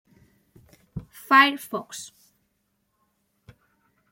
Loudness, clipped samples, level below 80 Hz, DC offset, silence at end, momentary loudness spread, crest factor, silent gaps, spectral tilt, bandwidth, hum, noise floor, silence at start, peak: -20 LUFS; under 0.1%; -60 dBFS; under 0.1%; 2.05 s; 24 LU; 24 dB; none; -3 dB/octave; 16.5 kHz; none; -73 dBFS; 0.95 s; -4 dBFS